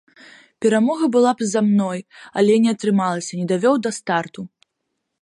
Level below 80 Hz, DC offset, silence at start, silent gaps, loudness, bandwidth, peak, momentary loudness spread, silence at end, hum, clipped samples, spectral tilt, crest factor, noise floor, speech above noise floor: -70 dBFS; under 0.1%; 0.6 s; none; -19 LUFS; 11.5 kHz; -4 dBFS; 12 LU; 0.75 s; none; under 0.1%; -5.5 dB/octave; 16 dB; -76 dBFS; 58 dB